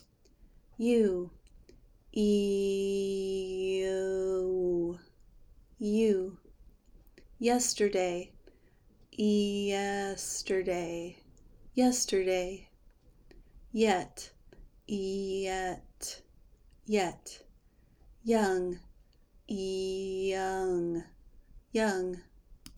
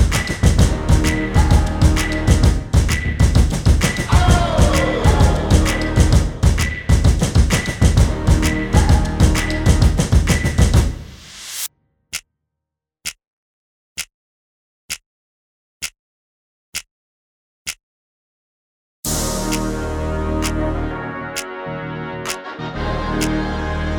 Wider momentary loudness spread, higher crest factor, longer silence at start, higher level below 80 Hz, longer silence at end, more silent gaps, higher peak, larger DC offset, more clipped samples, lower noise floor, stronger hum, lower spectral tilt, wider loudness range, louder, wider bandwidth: about the same, 14 LU vs 14 LU; about the same, 20 dB vs 16 dB; first, 0.8 s vs 0 s; second, -56 dBFS vs -20 dBFS; about the same, 0 s vs 0 s; second, none vs 13.27-13.96 s, 14.14-14.89 s, 15.06-15.80 s, 15.99-16.73 s, 16.91-17.66 s, 17.83-19.03 s; second, -14 dBFS vs 0 dBFS; neither; neither; second, -63 dBFS vs -82 dBFS; neither; about the same, -4.5 dB/octave vs -5.5 dB/octave; second, 4 LU vs 18 LU; second, -32 LUFS vs -17 LUFS; about the same, over 20 kHz vs 19.5 kHz